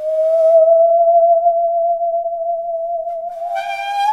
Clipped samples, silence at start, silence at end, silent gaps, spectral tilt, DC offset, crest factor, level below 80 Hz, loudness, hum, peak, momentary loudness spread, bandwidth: under 0.1%; 0 s; 0 s; none; -1 dB/octave; 0.1%; 12 dB; -62 dBFS; -15 LUFS; none; -4 dBFS; 12 LU; 6.4 kHz